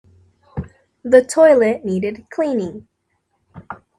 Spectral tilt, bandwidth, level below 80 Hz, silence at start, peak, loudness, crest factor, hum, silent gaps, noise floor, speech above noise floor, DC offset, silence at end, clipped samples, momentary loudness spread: -6 dB/octave; 12 kHz; -52 dBFS; 0.55 s; 0 dBFS; -16 LUFS; 18 dB; none; none; -69 dBFS; 54 dB; under 0.1%; 0.25 s; under 0.1%; 23 LU